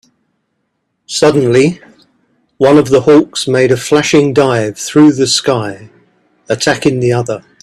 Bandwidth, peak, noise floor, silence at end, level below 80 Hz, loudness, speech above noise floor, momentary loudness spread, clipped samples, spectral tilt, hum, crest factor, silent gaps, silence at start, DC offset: 13 kHz; 0 dBFS; -66 dBFS; 0.25 s; -50 dBFS; -11 LUFS; 56 dB; 9 LU; under 0.1%; -5 dB/octave; none; 12 dB; none; 1.1 s; under 0.1%